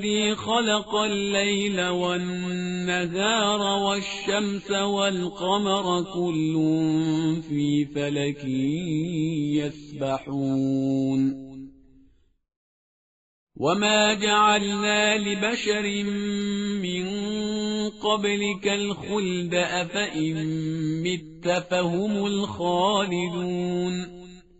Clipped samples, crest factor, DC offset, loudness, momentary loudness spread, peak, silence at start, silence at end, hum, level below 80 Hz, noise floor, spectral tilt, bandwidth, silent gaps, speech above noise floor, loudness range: under 0.1%; 18 dB; under 0.1%; -25 LUFS; 7 LU; -6 dBFS; 0 s; 0.2 s; none; -58 dBFS; -59 dBFS; -3.5 dB/octave; 8 kHz; 12.56-13.47 s; 34 dB; 4 LU